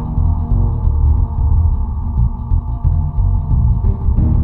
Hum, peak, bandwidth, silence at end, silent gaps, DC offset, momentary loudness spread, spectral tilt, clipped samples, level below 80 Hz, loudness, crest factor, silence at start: none; -4 dBFS; 1.5 kHz; 0 s; none; under 0.1%; 4 LU; -13.5 dB/octave; under 0.1%; -16 dBFS; -17 LUFS; 10 dB; 0 s